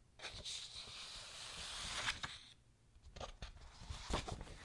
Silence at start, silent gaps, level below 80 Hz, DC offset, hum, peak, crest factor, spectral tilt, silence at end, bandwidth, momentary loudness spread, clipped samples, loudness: 0 s; none; -56 dBFS; under 0.1%; none; -26 dBFS; 24 dB; -2 dB/octave; 0 s; 11.5 kHz; 17 LU; under 0.1%; -47 LUFS